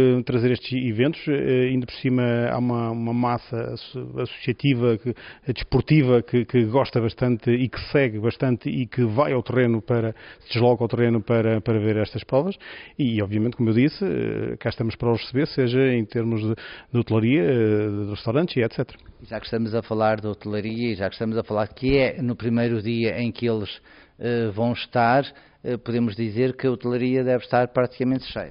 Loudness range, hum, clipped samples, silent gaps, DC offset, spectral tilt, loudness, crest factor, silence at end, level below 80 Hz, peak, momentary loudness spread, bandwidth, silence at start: 3 LU; none; under 0.1%; none; under 0.1%; -6.5 dB/octave; -23 LUFS; 16 dB; 0 s; -48 dBFS; -6 dBFS; 9 LU; 5.4 kHz; 0 s